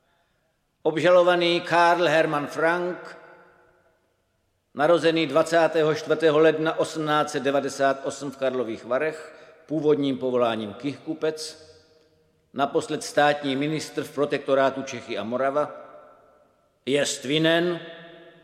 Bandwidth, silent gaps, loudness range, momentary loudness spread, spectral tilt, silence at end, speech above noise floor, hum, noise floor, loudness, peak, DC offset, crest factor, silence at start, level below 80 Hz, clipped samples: 15 kHz; none; 5 LU; 13 LU; -4.5 dB/octave; 0.15 s; 48 dB; none; -71 dBFS; -23 LUFS; -6 dBFS; under 0.1%; 20 dB; 0.85 s; -72 dBFS; under 0.1%